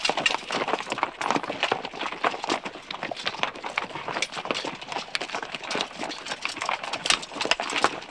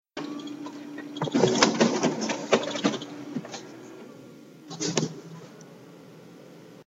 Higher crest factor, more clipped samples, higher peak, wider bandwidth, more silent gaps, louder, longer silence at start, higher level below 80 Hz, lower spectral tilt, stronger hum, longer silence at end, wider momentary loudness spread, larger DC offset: about the same, 30 dB vs 28 dB; neither; about the same, 0 dBFS vs 0 dBFS; second, 11 kHz vs 15.5 kHz; neither; about the same, -28 LUFS vs -27 LUFS; second, 0 s vs 0.15 s; first, -64 dBFS vs -70 dBFS; second, -1.5 dB/octave vs -4 dB/octave; neither; about the same, 0 s vs 0.05 s; second, 8 LU vs 26 LU; neither